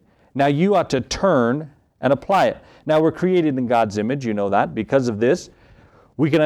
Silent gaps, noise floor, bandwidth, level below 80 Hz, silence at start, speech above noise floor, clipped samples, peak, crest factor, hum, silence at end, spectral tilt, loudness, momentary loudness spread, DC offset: none; -50 dBFS; 13 kHz; -50 dBFS; 0.35 s; 32 dB; under 0.1%; -4 dBFS; 16 dB; none; 0 s; -6.5 dB/octave; -19 LUFS; 7 LU; under 0.1%